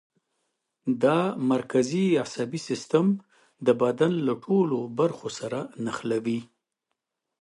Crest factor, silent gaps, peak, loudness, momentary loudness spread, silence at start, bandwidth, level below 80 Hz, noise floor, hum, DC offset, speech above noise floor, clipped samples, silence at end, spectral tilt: 18 dB; none; -8 dBFS; -26 LUFS; 9 LU; 0.85 s; 11.5 kHz; -72 dBFS; -83 dBFS; none; under 0.1%; 58 dB; under 0.1%; 0.95 s; -6.5 dB/octave